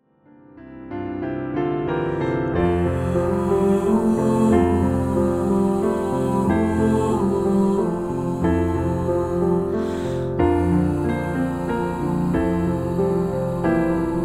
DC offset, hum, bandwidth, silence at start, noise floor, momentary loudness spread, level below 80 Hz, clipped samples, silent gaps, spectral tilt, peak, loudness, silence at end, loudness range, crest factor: under 0.1%; none; 14 kHz; 0.55 s; -51 dBFS; 6 LU; -38 dBFS; under 0.1%; none; -8.5 dB/octave; -4 dBFS; -21 LUFS; 0 s; 3 LU; 16 dB